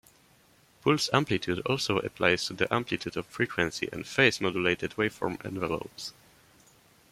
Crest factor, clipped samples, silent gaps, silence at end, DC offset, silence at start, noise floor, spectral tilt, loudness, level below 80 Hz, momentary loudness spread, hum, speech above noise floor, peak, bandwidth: 24 dB; under 0.1%; none; 1 s; under 0.1%; 0.85 s; -62 dBFS; -4.5 dB/octave; -28 LUFS; -60 dBFS; 10 LU; none; 33 dB; -6 dBFS; 16 kHz